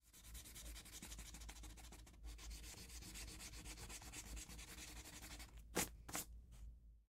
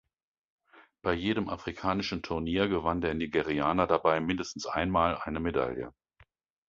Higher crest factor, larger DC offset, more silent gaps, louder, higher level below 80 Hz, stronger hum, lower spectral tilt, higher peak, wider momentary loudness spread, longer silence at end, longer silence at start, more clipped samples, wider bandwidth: about the same, 26 dB vs 22 dB; neither; neither; second, -53 LUFS vs -30 LUFS; second, -58 dBFS vs -50 dBFS; neither; second, -2.5 dB/octave vs -6 dB/octave; second, -28 dBFS vs -10 dBFS; first, 13 LU vs 7 LU; second, 0.05 s vs 0.8 s; second, 0.05 s vs 0.75 s; neither; first, 16 kHz vs 7.6 kHz